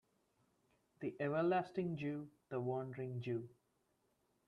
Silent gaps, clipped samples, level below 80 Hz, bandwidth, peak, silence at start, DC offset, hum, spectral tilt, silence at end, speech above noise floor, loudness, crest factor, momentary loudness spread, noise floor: none; under 0.1%; -82 dBFS; 6.8 kHz; -26 dBFS; 1 s; under 0.1%; none; -9 dB/octave; 1 s; 40 dB; -42 LUFS; 16 dB; 11 LU; -81 dBFS